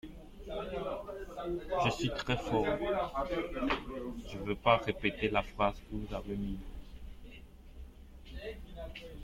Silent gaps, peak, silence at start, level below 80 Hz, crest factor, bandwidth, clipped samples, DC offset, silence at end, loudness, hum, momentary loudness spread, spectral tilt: none; -12 dBFS; 0.05 s; -48 dBFS; 24 dB; 16.5 kHz; under 0.1%; under 0.1%; 0 s; -35 LUFS; none; 21 LU; -6 dB/octave